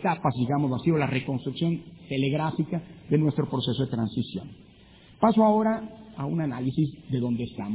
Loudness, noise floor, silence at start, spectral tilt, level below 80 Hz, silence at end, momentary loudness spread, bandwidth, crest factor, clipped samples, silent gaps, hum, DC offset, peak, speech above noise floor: -27 LUFS; -53 dBFS; 0 s; -11.5 dB/octave; -58 dBFS; 0 s; 11 LU; 4 kHz; 20 dB; under 0.1%; none; none; under 0.1%; -8 dBFS; 27 dB